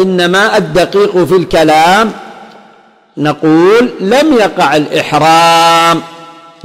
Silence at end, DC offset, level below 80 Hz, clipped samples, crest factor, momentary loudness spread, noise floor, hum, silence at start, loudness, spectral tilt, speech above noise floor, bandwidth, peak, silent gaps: 0.35 s; under 0.1%; -40 dBFS; under 0.1%; 8 dB; 9 LU; -43 dBFS; none; 0 s; -8 LUFS; -4.5 dB/octave; 35 dB; 16.5 kHz; 0 dBFS; none